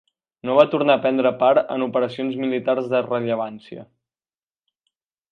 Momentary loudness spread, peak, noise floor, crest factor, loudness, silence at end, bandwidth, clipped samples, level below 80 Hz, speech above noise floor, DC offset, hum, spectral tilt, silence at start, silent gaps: 15 LU; 0 dBFS; under -90 dBFS; 20 dB; -20 LUFS; 1.5 s; 6.2 kHz; under 0.1%; -70 dBFS; over 70 dB; under 0.1%; none; -7.5 dB/octave; 0.45 s; none